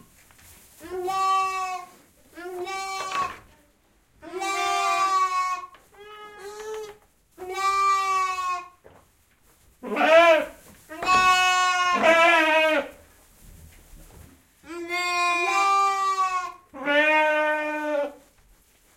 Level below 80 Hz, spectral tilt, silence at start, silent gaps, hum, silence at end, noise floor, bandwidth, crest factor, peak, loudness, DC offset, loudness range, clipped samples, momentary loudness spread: -60 dBFS; -1.5 dB/octave; 0.8 s; none; none; 0.8 s; -62 dBFS; 16.5 kHz; 20 dB; -4 dBFS; -22 LUFS; under 0.1%; 9 LU; under 0.1%; 21 LU